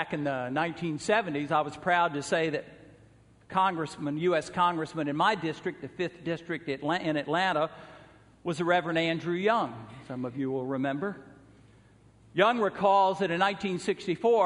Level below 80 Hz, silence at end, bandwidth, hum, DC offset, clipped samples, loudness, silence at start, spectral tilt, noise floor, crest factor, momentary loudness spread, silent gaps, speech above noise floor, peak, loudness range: -66 dBFS; 0 s; 10.5 kHz; none; under 0.1%; under 0.1%; -29 LUFS; 0 s; -5.5 dB/octave; -58 dBFS; 22 dB; 10 LU; none; 30 dB; -8 dBFS; 3 LU